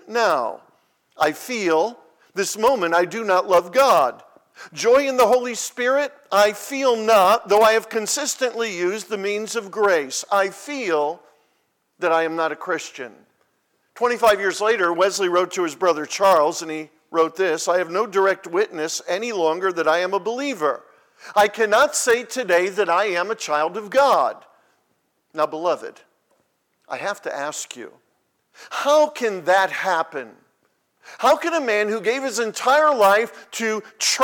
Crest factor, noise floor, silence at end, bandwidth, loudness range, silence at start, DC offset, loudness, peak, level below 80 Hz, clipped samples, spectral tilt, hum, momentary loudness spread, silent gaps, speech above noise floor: 16 dB; -69 dBFS; 0 s; 19 kHz; 6 LU; 0.05 s; under 0.1%; -20 LUFS; -6 dBFS; -66 dBFS; under 0.1%; -2 dB/octave; none; 11 LU; none; 49 dB